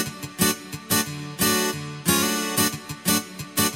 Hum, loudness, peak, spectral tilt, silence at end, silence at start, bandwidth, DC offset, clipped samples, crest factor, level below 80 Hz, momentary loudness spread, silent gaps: none; -23 LUFS; -4 dBFS; -2.5 dB/octave; 0 s; 0 s; 17 kHz; under 0.1%; under 0.1%; 20 dB; -54 dBFS; 7 LU; none